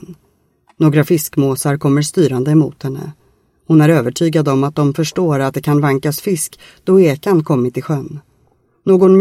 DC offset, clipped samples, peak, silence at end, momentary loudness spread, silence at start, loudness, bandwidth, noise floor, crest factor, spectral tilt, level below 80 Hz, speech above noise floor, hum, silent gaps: under 0.1%; under 0.1%; 0 dBFS; 0 s; 12 LU; 0.1 s; -14 LUFS; 16 kHz; -58 dBFS; 14 dB; -6.5 dB/octave; -54 dBFS; 45 dB; none; none